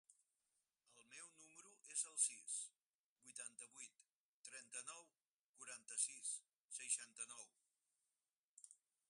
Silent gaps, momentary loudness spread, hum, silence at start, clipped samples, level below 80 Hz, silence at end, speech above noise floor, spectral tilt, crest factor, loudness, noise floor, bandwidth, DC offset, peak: 2.82-3.16 s, 4.09-4.44 s, 5.26-5.54 s, 6.55-6.69 s, 8.33-8.57 s; 22 LU; none; 0.1 s; under 0.1%; under -90 dBFS; 0.35 s; over 38 dB; 2.5 dB/octave; 28 dB; -47 LUFS; under -90 dBFS; 11.5 kHz; under 0.1%; -24 dBFS